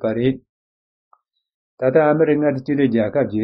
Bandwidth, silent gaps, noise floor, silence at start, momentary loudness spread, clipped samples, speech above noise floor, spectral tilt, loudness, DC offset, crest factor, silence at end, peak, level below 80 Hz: 5.6 kHz; 0.49-1.11 s, 1.54-1.77 s; under -90 dBFS; 0 s; 7 LU; under 0.1%; over 73 dB; -7 dB/octave; -18 LUFS; under 0.1%; 16 dB; 0 s; -4 dBFS; -56 dBFS